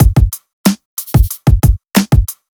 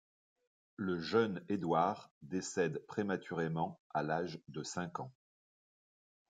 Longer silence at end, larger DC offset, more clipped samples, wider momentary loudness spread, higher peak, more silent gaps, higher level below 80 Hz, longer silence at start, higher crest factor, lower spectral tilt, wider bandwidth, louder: second, 0.25 s vs 1.2 s; neither; neither; second, 6 LU vs 10 LU; first, 0 dBFS vs -18 dBFS; about the same, 0.53-0.64 s, 0.85-0.97 s vs 2.11-2.21 s, 3.79-3.90 s; first, -16 dBFS vs -78 dBFS; second, 0 s vs 0.8 s; second, 12 dB vs 20 dB; about the same, -6 dB/octave vs -5.5 dB/octave; first, over 20 kHz vs 9.4 kHz; first, -14 LUFS vs -38 LUFS